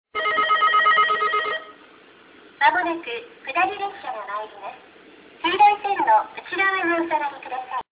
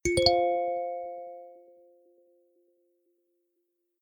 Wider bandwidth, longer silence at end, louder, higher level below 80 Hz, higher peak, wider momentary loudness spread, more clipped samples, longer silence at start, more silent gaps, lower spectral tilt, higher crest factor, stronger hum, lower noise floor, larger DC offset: second, 4 kHz vs 18.5 kHz; second, 0.1 s vs 2.45 s; first, -21 LUFS vs -27 LUFS; second, -66 dBFS vs -52 dBFS; about the same, -6 dBFS vs -6 dBFS; second, 15 LU vs 21 LU; neither; about the same, 0.15 s vs 0.05 s; neither; first, -5.5 dB/octave vs -3.5 dB/octave; second, 16 dB vs 26 dB; neither; second, -49 dBFS vs -79 dBFS; neither